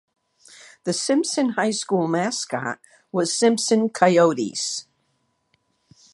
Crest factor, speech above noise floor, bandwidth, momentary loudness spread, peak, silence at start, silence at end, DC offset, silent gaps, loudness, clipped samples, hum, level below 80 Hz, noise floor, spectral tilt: 22 dB; 49 dB; 11.5 kHz; 11 LU; -2 dBFS; 0.85 s; 1.3 s; under 0.1%; none; -21 LUFS; under 0.1%; none; -74 dBFS; -70 dBFS; -4 dB/octave